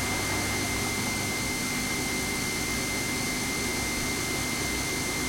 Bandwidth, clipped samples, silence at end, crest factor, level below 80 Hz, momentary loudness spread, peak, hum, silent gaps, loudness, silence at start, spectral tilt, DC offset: 16.5 kHz; under 0.1%; 0 s; 12 dB; -44 dBFS; 1 LU; -16 dBFS; 50 Hz at -40 dBFS; none; -28 LUFS; 0 s; -2.5 dB/octave; under 0.1%